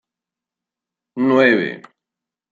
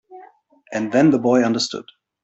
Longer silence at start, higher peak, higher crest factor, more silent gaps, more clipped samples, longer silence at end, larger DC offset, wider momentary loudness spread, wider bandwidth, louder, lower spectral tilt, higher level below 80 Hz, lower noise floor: first, 1.15 s vs 0.1 s; about the same, -2 dBFS vs -4 dBFS; about the same, 18 dB vs 16 dB; neither; neither; first, 0.75 s vs 0.4 s; neither; first, 21 LU vs 13 LU; second, 7.4 kHz vs 8.2 kHz; about the same, -16 LUFS vs -18 LUFS; first, -7 dB/octave vs -5 dB/octave; second, -70 dBFS vs -62 dBFS; first, -87 dBFS vs -50 dBFS